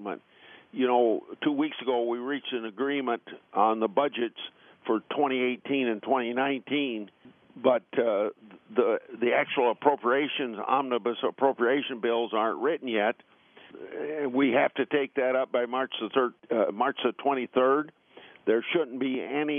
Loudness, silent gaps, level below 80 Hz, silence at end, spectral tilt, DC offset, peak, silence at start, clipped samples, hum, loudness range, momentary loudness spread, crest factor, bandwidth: -28 LUFS; none; -84 dBFS; 0 s; -2.5 dB/octave; under 0.1%; -8 dBFS; 0 s; under 0.1%; none; 2 LU; 9 LU; 20 dB; 3.7 kHz